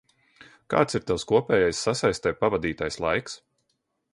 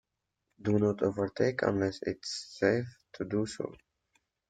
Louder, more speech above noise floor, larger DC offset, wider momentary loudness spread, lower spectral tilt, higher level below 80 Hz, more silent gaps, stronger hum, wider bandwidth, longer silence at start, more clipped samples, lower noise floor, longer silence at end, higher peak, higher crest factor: first, -25 LUFS vs -32 LUFS; about the same, 51 dB vs 52 dB; neither; second, 7 LU vs 11 LU; second, -4.5 dB/octave vs -6 dB/octave; first, -52 dBFS vs -64 dBFS; neither; neither; first, 11.5 kHz vs 9.2 kHz; about the same, 0.7 s vs 0.6 s; neither; second, -76 dBFS vs -83 dBFS; about the same, 0.75 s vs 0.75 s; first, -6 dBFS vs -10 dBFS; about the same, 20 dB vs 22 dB